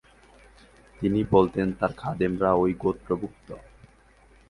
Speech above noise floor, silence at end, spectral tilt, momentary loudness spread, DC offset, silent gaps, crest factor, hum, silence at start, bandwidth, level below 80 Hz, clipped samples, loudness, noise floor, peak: 32 dB; 0.9 s; -9 dB/octave; 18 LU; under 0.1%; none; 20 dB; none; 1 s; 11 kHz; -50 dBFS; under 0.1%; -25 LUFS; -56 dBFS; -6 dBFS